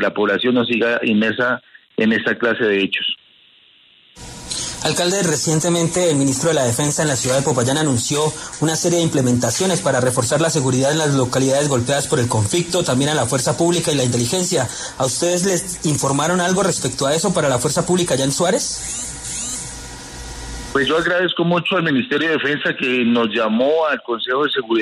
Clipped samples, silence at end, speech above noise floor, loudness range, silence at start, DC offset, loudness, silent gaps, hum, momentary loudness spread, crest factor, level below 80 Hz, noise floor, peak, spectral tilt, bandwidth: under 0.1%; 0 s; 34 dB; 4 LU; 0 s; under 0.1%; -18 LUFS; none; none; 7 LU; 16 dB; -46 dBFS; -51 dBFS; -4 dBFS; -4 dB/octave; 13.5 kHz